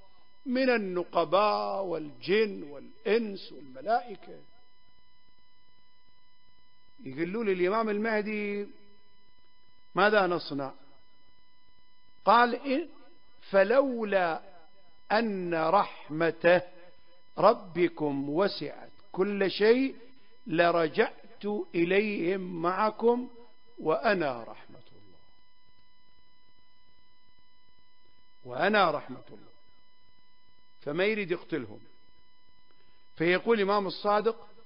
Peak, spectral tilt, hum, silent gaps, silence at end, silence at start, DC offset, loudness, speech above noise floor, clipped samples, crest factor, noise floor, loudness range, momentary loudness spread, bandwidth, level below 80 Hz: -8 dBFS; -9.5 dB/octave; none; none; 0.25 s; 0.45 s; 0.4%; -28 LUFS; 39 dB; under 0.1%; 24 dB; -67 dBFS; 8 LU; 17 LU; 5.4 kHz; -72 dBFS